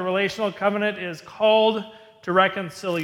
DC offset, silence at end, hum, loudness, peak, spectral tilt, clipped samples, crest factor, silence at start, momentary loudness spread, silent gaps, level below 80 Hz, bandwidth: under 0.1%; 0 s; none; -22 LUFS; -4 dBFS; -5 dB/octave; under 0.1%; 18 dB; 0 s; 14 LU; none; -66 dBFS; 15.5 kHz